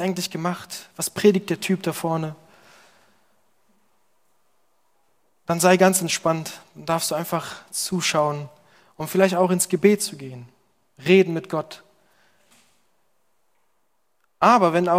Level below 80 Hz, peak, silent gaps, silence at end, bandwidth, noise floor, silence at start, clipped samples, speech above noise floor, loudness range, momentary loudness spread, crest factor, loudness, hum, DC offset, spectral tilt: -68 dBFS; -2 dBFS; none; 0 s; 16.5 kHz; -72 dBFS; 0 s; under 0.1%; 51 dB; 9 LU; 19 LU; 22 dB; -21 LUFS; none; under 0.1%; -4.5 dB/octave